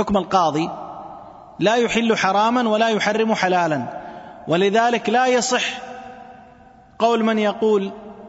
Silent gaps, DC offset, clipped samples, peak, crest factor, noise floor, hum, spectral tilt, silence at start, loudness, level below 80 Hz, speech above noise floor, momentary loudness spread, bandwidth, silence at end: none; under 0.1%; under 0.1%; -2 dBFS; 18 dB; -47 dBFS; none; -4 dB/octave; 0 s; -19 LUFS; -54 dBFS; 29 dB; 18 LU; 8 kHz; 0 s